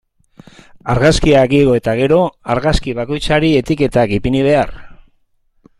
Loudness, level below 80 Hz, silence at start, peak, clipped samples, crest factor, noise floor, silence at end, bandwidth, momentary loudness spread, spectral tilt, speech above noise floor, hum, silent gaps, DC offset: -14 LUFS; -30 dBFS; 0.85 s; 0 dBFS; under 0.1%; 14 dB; -57 dBFS; 0.85 s; 13 kHz; 9 LU; -6 dB/octave; 45 dB; none; none; under 0.1%